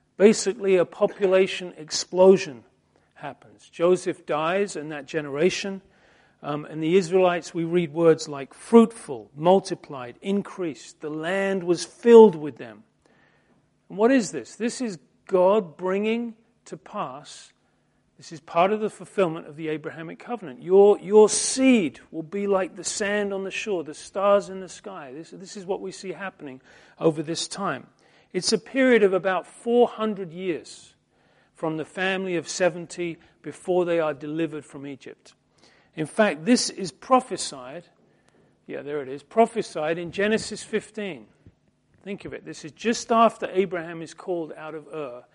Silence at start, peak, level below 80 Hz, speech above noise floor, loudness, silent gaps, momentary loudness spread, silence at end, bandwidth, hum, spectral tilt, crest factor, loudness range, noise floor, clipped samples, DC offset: 0.2 s; -2 dBFS; -68 dBFS; 43 dB; -23 LUFS; none; 20 LU; 0.15 s; 11.5 kHz; none; -4.5 dB/octave; 24 dB; 8 LU; -67 dBFS; under 0.1%; under 0.1%